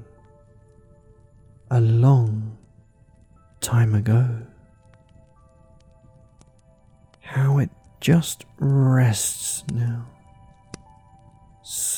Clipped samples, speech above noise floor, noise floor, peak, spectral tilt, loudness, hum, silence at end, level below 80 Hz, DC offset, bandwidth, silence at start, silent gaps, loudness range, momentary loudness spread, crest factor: under 0.1%; 36 dB; -55 dBFS; -6 dBFS; -5.5 dB/octave; -21 LUFS; none; 0 s; -56 dBFS; under 0.1%; 18 kHz; 0 s; none; 7 LU; 17 LU; 18 dB